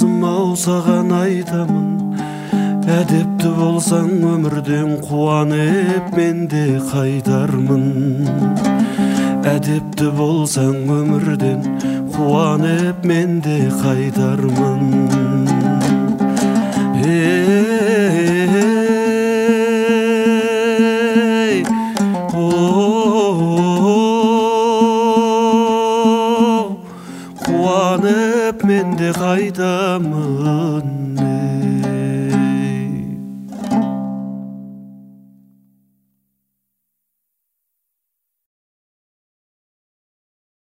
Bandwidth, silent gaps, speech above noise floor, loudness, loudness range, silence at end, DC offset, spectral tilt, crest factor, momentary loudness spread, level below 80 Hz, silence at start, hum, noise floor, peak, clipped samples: 16 kHz; none; 61 dB; -16 LUFS; 5 LU; 5.75 s; under 0.1%; -6.5 dB/octave; 14 dB; 6 LU; -54 dBFS; 0 s; none; -76 dBFS; 0 dBFS; under 0.1%